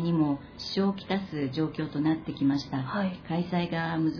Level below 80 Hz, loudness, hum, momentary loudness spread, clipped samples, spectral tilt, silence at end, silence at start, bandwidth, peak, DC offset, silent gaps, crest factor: -58 dBFS; -30 LUFS; none; 5 LU; under 0.1%; -7.5 dB/octave; 0 s; 0 s; 5.4 kHz; -14 dBFS; under 0.1%; none; 14 dB